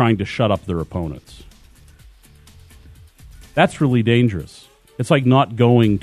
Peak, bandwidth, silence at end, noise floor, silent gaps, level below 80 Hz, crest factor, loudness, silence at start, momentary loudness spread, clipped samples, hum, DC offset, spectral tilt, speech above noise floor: -2 dBFS; 12.5 kHz; 0 s; -47 dBFS; none; -44 dBFS; 18 dB; -18 LUFS; 0 s; 16 LU; under 0.1%; none; under 0.1%; -7.5 dB/octave; 30 dB